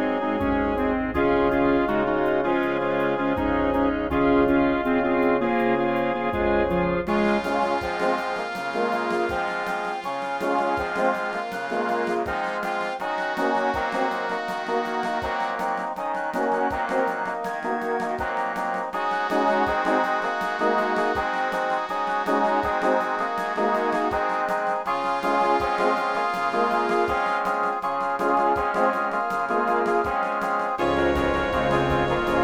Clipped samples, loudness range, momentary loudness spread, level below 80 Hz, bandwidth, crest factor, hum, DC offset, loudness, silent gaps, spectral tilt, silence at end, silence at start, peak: under 0.1%; 4 LU; 5 LU; -44 dBFS; 16 kHz; 14 dB; none; under 0.1%; -24 LUFS; none; -6 dB/octave; 0 s; 0 s; -8 dBFS